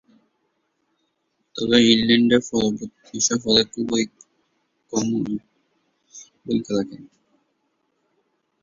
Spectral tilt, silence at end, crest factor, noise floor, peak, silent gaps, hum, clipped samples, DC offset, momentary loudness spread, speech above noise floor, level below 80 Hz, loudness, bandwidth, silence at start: -3.5 dB/octave; 1.55 s; 22 dB; -72 dBFS; -2 dBFS; none; none; under 0.1%; under 0.1%; 17 LU; 52 dB; -58 dBFS; -20 LUFS; 7.6 kHz; 1.55 s